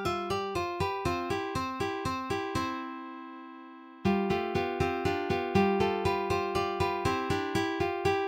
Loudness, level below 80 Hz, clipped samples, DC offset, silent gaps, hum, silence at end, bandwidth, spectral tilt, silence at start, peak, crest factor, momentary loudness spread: -31 LUFS; -52 dBFS; under 0.1%; under 0.1%; none; none; 0 s; 16.5 kHz; -6 dB/octave; 0 s; -14 dBFS; 18 dB; 13 LU